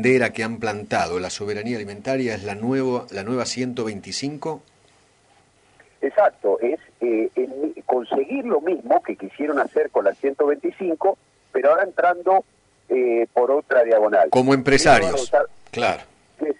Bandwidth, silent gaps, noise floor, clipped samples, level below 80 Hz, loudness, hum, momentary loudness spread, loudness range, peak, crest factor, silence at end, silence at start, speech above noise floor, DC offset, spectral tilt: 11 kHz; none; -58 dBFS; under 0.1%; -52 dBFS; -21 LUFS; none; 11 LU; 8 LU; -4 dBFS; 18 dB; 0.05 s; 0 s; 37 dB; under 0.1%; -5 dB/octave